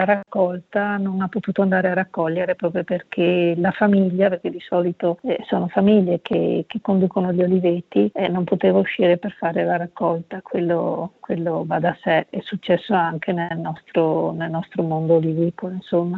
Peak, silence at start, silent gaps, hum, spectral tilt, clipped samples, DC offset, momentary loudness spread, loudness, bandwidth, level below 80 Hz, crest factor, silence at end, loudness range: -4 dBFS; 0 s; none; none; -9.5 dB/octave; under 0.1%; under 0.1%; 7 LU; -21 LUFS; 4.3 kHz; -62 dBFS; 16 dB; 0 s; 3 LU